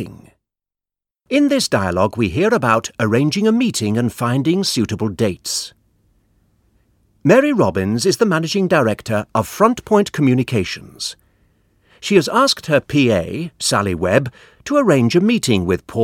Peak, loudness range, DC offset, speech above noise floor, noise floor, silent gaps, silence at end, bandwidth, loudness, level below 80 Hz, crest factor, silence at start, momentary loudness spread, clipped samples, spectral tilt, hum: 0 dBFS; 3 LU; under 0.1%; 73 dB; -89 dBFS; none; 0 s; 17 kHz; -17 LUFS; -48 dBFS; 16 dB; 0 s; 8 LU; under 0.1%; -5 dB/octave; none